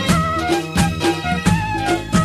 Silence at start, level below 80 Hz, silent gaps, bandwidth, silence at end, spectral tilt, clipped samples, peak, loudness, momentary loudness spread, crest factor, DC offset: 0 s; -32 dBFS; none; 14.5 kHz; 0 s; -5 dB/octave; under 0.1%; -2 dBFS; -18 LUFS; 2 LU; 16 dB; under 0.1%